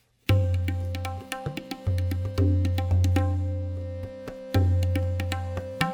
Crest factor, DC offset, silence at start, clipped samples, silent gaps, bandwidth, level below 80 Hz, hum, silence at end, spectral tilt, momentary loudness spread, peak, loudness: 18 dB; under 0.1%; 0.3 s; under 0.1%; none; 16 kHz; -40 dBFS; none; 0 s; -7 dB/octave; 10 LU; -8 dBFS; -27 LUFS